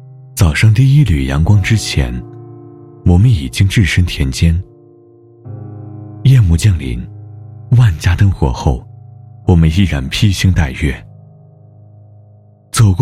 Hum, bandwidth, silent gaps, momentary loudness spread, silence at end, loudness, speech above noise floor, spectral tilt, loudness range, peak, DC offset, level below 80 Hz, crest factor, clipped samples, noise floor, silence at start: none; 14 kHz; none; 20 LU; 0 s; -13 LUFS; 33 dB; -6 dB/octave; 3 LU; 0 dBFS; under 0.1%; -26 dBFS; 12 dB; under 0.1%; -43 dBFS; 0.05 s